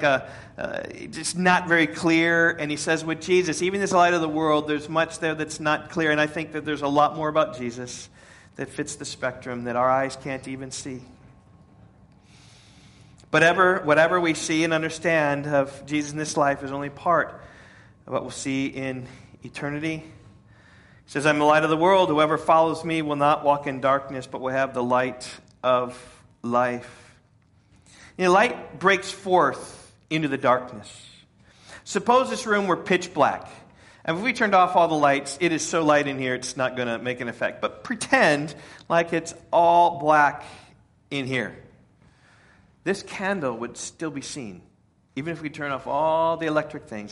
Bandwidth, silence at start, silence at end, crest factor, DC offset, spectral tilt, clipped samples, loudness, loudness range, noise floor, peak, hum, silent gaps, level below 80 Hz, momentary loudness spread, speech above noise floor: 11.5 kHz; 0 s; 0 s; 20 dB; under 0.1%; -4.5 dB/octave; under 0.1%; -23 LUFS; 9 LU; -59 dBFS; -4 dBFS; none; none; -60 dBFS; 16 LU; 36 dB